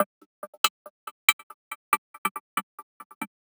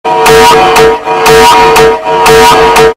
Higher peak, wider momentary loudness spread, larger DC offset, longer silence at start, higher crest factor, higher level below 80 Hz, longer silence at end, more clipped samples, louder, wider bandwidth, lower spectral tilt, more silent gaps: about the same, 0 dBFS vs 0 dBFS; first, 23 LU vs 4 LU; neither; about the same, 0 s vs 0.05 s; first, 30 dB vs 4 dB; second, under -90 dBFS vs -26 dBFS; about the same, 0.15 s vs 0.05 s; second, under 0.1% vs 5%; second, -27 LUFS vs -3 LUFS; first, over 20 kHz vs 16.5 kHz; second, 0 dB/octave vs -3 dB/octave; first, 0.06-0.42 s, 0.48-0.64 s, 0.70-1.92 s, 1.98-2.25 s, 2.31-2.57 s, 2.63-3.21 s vs none